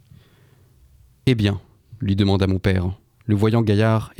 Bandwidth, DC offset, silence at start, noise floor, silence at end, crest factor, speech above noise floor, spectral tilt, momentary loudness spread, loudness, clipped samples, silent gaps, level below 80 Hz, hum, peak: 11.5 kHz; under 0.1%; 1.25 s; -53 dBFS; 0.1 s; 16 dB; 35 dB; -8 dB/octave; 11 LU; -20 LUFS; under 0.1%; none; -44 dBFS; none; -4 dBFS